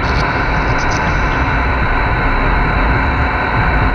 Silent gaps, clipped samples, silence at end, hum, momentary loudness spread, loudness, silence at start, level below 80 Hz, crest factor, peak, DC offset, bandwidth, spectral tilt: none; under 0.1%; 0 s; none; 1 LU; -15 LUFS; 0 s; -18 dBFS; 12 dB; -2 dBFS; under 0.1%; 7 kHz; -6 dB/octave